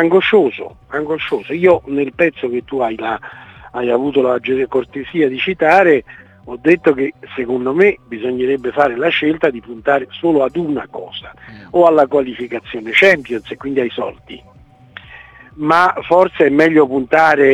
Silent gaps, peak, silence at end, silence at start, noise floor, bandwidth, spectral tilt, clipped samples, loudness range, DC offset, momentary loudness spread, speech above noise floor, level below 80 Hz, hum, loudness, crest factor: none; 0 dBFS; 0 s; 0 s; -40 dBFS; 9.6 kHz; -6.5 dB/octave; under 0.1%; 3 LU; under 0.1%; 14 LU; 25 dB; -50 dBFS; none; -15 LUFS; 16 dB